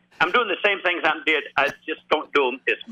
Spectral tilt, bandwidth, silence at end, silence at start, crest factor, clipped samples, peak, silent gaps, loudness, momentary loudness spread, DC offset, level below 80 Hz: -3.5 dB/octave; 14.5 kHz; 0 s; 0.2 s; 16 dB; under 0.1%; -6 dBFS; none; -21 LUFS; 5 LU; under 0.1%; -62 dBFS